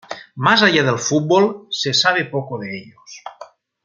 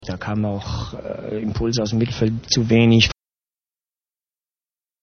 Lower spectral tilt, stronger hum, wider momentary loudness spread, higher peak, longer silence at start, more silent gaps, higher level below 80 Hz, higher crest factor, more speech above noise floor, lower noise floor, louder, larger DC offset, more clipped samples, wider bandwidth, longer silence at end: second, -3.5 dB/octave vs -5 dB/octave; neither; first, 22 LU vs 14 LU; about the same, -2 dBFS vs -2 dBFS; about the same, 0.1 s vs 0 s; neither; second, -64 dBFS vs -40 dBFS; about the same, 18 dB vs 20 dB; second, 25 dB vs over 71 dB; second, -42 dBFS vs under -90 dBFS; first, -16 LUFS vs -20 LUFS; neither; neither; first, 7.6 kHz vs 6.6 kHz; second, 0.4 s vs 1.9 s